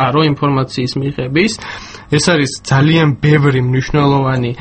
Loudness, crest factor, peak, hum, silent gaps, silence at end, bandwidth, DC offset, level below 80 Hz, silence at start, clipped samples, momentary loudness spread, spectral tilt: -13 LUFS; 12 dB; 0 dBFS; none; none; 0 s; 8.8 kHz; under 0.1%; -38 dBFS; 0 s; under 0.1%; 7 LU; -6 dB/octave